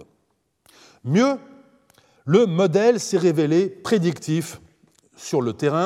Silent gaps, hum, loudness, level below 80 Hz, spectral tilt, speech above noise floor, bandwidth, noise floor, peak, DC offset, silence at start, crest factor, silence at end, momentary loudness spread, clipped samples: none; none; -20 LUFS; -68 dBFS; -6 dB/octave; 50 dB; 15 kHz; -70 dBFS; -4 dBFS; under 0.1%; 1.05 s; 18 dB; 0 s; 14 LU; under 0.1%